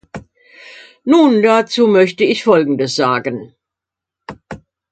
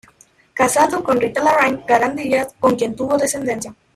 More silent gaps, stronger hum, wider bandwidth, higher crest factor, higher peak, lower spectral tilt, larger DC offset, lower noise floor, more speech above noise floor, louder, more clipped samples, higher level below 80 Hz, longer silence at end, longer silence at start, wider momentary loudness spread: neither; neither; second, 9.2 kHz vs 16 kHz; about the same, 14 dB vs 16 dB; about the same, 0 dBFS vs -2 dBFS; first, -5.5 dB/octave vs -4 dB/octave; neither; first, -84 dBFS vs -52 dBFS; first, 72 dB vs 35 dB; first, -13 LUFS vs -17 LUFS; neither; about the same, -56 dBFS vs -54 dBFS; about the same, 0.35 s vs 0.25 s; second, 0.15 s vs 0.55 s; first, 24 LU vs 7 LU